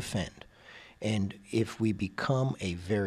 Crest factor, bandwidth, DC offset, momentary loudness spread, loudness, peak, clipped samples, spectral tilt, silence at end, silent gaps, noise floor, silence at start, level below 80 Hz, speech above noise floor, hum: 16 dB; 14 kHz; under 0.1%; 21 LU; -32 LUFS; -16 dBFS; under 0.1%; -6 dB/octave; 0 s; none; -53 dBFS; 0 s; -56 dBFS; 22 dB; none